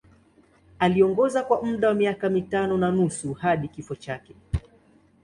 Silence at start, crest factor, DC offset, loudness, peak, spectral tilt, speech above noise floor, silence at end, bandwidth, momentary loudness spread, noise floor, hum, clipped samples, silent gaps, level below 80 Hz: 0.8 s; 18 dB; under 0.1%; -24 LUFS; -6 dBFS; -6.5 dB/octave; 35 dB; 0.65 s; 11 kHz; 14 LU; -58 dBFS; none; under 0.1%; none; -44 dBFS